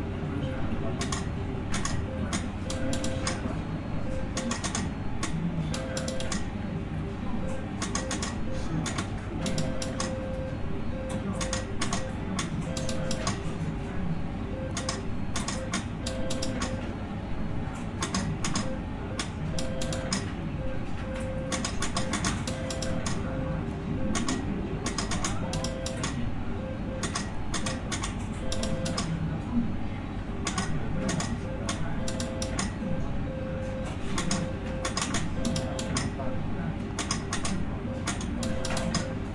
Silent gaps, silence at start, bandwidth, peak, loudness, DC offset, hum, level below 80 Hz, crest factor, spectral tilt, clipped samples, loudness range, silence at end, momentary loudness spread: none; 0 s; 11.5 kHz; -12 dBFS; -32 LUFS; under 0.1%; none; -40 dBFS; 18 dB; -4.5 dB/octave; under 0.1%; 1 LU; 0 s; 4 LU